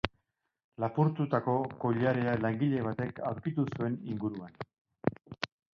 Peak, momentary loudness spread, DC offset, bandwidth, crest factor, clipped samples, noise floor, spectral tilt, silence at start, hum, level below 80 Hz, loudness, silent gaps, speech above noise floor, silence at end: -10 dBFS; 11 LU; under 0.1%; 6.8 kHz; 22 dB; under 0.1%; -80 dBFS; -8.5 dB/octave; 0.05 s; none; -62 dBFS; -33 LUFS; 0.64-0.72 s, 4.81-4.85 s; 48 dB; 0.3 s